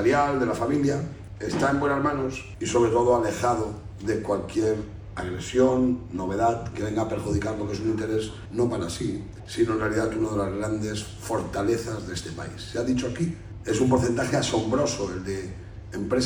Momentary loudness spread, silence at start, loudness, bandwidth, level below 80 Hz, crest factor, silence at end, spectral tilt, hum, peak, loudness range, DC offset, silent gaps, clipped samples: 11 LU; 0 s; -26 LUFS; 17 kHz; -44 dBFS; 18 dB; 0 s; -5.5 dB/octave; none; -8 dBFS; 4 LU; under 0.1%; none; under 0.1%